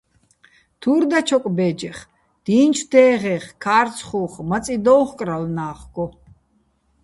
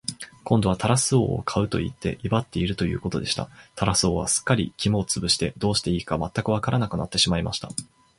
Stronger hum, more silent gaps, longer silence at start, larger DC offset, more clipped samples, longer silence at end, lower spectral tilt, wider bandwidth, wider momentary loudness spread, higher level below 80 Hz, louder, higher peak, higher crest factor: neither; neither; first, 0.8 s vs 0.1 s; neither; neither; first, 0.95 s vs 0.35 s; about the same, -5.5 dB/octave vs -4.5 dB/octave; about the same, 11.5 kHz vs 11.5 kHz; first, 15 LU vs 8 LU; second, -52 dBFS vs -42 dBFS; first, -19 LUFS vs -24 LUFS; about the same, -2 dBFS vs -4 dBFS; about the same, 18 dB vs 22 dB